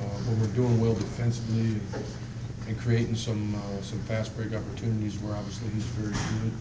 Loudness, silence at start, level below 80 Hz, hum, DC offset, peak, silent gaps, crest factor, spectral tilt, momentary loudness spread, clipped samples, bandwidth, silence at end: -30 LUFS; 0 s; -46 dBFS; none; under 0.1%; -14 dBFS; none; 14 dB; -7 dB/octave; 9 LU; under 0.1%; 8 kHz; 0 s